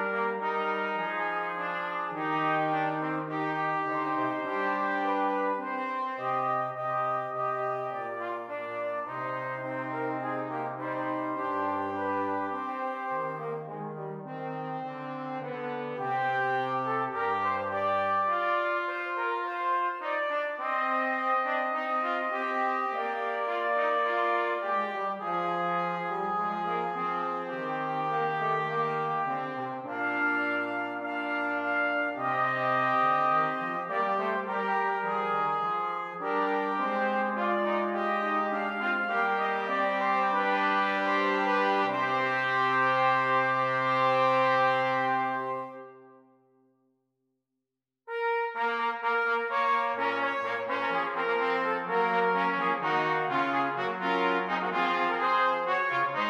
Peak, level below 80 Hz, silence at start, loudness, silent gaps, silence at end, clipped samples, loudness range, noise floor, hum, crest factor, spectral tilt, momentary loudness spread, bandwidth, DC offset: -14 dBFS; -86 dBFS; 0 s; -29 LUFS; none; 0 s; under 0.1%; 7 LU; -87 dBFS; none; 16 dB; -6 dB/octave; 8 LU; 11.5 kHz; under 0.1%